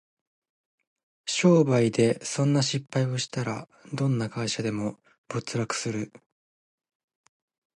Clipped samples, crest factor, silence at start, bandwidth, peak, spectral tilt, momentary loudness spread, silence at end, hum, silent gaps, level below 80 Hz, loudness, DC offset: under 0.1%; 20 dB; 1.25 s; 11.5 kHz; -8 dBFS; -5.5 dB/octave; 14 LU; 1.7 s; none; 5.18-5.24 s; -66 dBFS; -26 LUFS; under 0.1%